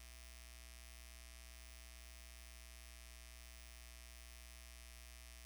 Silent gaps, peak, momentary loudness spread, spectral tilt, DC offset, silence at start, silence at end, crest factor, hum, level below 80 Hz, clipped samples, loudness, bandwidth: none; -38 dBFS; 0 LU; -2 dB/octave; under 0.1%; 0 s; 0 s; 18 dB; 60 Hz at -60 dBFS; -58 dBFS; under 0.1%; -57 LUFS; over 20 kHz